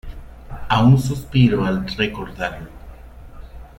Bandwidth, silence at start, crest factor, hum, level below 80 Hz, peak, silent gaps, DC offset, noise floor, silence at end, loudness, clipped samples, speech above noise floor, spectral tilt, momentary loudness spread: 13 kHz; 0.05 s; 18 dB; none; -36 dBFS; -2 dBFS; none; under 0.1%; -38 dBFS; 0.1 s; -19 LUFS; under 0.1%; 21 dB; -7 dB/octave; 24 LU